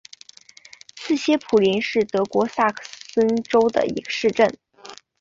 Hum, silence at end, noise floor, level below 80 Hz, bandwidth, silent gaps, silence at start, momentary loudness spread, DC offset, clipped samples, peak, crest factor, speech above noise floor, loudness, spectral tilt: none; 0.25 s; -48 dBFS; -62 dBFS; 7.8 kHz; none; 0.95 s; 21 LU; under 0.1%; under 0.1%; -4 dBFS; 18 dB; 28 dB; -21 LUFS; -5 dB/octave